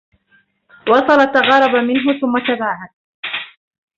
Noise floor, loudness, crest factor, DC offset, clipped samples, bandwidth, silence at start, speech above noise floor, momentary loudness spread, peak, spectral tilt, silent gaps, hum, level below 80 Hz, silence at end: -57 dBFS; -15 LUFS; 16 dB; under 0.1%; under 0.1%; 7.4 kHz; 0.85 s; 44 dB; 15 LU; 0 dBFS; -5 dB/octave; 2.93-3.23 s; none; -60 dBFS; 0.5 s